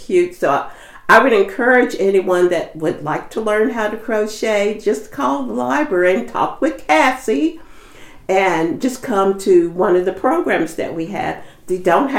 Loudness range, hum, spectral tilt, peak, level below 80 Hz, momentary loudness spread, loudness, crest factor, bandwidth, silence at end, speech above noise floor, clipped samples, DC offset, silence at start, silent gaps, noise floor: 3 LU; none; -5 dB/octave; 0 dBFS; -48 dBFS; 9 LU; -16 LUFS; 16 dB; 16 kHz; 0 s; 22 dB; under 0.1%; under 0.1%; 0 s; none; -38 dBFS